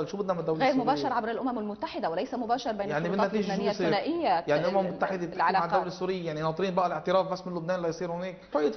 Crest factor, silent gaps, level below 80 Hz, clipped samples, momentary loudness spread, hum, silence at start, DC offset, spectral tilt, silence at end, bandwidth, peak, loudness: 16 dB; none; -62 dBFS; under 0.1%; 6 LU; none; 0 s; under 0.1%; -6 dB/octave; 0 s; 6.4 kHz; -12 dBFS; -29 LUFS